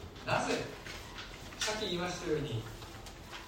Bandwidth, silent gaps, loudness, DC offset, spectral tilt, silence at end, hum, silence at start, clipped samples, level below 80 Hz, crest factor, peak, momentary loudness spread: 16 kHz; none; -37 LUFS; under 0.1%; -4 dB/octave; 0 s; none; 0 s; under 0.1%; -54 dBFS; 20 dB; -18 dBFS; 13 LU